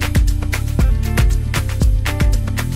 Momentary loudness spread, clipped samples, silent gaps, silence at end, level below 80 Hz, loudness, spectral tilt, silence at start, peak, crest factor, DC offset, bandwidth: 3 LU; under 0.1%; none; 0 s; -16 dBFS; -18 LUFS; -5.5 dB/octave; 0 s; -6 dBFS; 10 dB; under 0.1%; 16 kHz